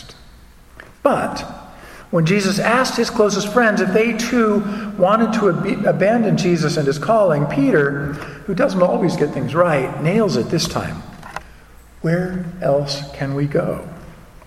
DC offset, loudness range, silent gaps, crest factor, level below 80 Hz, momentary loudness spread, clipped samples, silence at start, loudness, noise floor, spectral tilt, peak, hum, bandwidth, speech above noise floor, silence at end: under 0.1%; 6 LU; none; 18 dB; -44 dBFS; 12 LU; under 0.1%; 0 s; -18 LUFS; -44 dBFS; -5.5 dB/octave; 0 dBFS; none; 15 kHz; 27 dB; 0.3 s